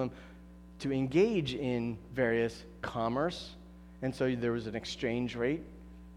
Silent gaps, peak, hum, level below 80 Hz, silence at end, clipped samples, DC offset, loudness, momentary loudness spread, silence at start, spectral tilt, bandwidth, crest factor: none; -16 dBFS; 60 Hz at -55 dBFS; -54 dBFS; 0 s; under 0.1%; under 0.1%; -33 LUFS; 22 LU; 0 s; -6.5 dB/octave; 12 kHz; 18 dB